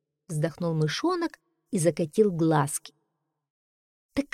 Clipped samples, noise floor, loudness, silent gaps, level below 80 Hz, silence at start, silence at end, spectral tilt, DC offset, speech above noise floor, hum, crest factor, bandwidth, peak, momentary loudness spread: under 0.1%; -80 dBFS; -27 LUFS; 3.50-4.09 s; -62 dBFS; 0.3 s; 0.1 s; -5.5 dB/octave; under 0.1%; 54 dB; none; 18 dB; 15.5 kHz; -10 dBFS; 10 LU